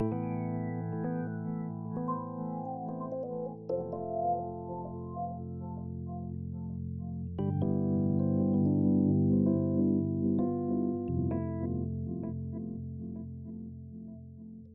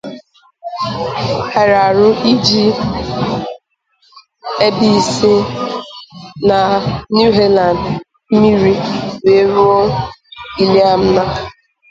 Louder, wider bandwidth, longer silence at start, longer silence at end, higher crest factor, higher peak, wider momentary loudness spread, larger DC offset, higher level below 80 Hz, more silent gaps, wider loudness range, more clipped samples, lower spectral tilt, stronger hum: second, -33 LUFS vs -13 LUFS; second, 3.1 kHz vs 9 kHz; about the same, 0 s vs 0.05 s; second, 0 s vs 0.4 s; about the same, 16 dB vs 14 dB; second, -16 dBFS vs 0 dBFS; second, 13 LU vs 17 LU; neither; second, -56 dBFS vs -40 dBFS; neither; first, 9 LU vs 3 LU; neither; first, -10 dB/octave vs -5.5 dB/octave; neither